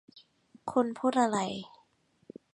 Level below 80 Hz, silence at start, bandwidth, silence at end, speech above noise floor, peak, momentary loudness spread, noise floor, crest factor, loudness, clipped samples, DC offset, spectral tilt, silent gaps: -76 dBFS; 0.15 s; 11 kHz; 0.85 s; 40 dB; -12 dBFS; 16 LU; -69 dBFS; 20 dB; -30 LUFS; under 0.1%; under 0.1%; -5 dB/octave; none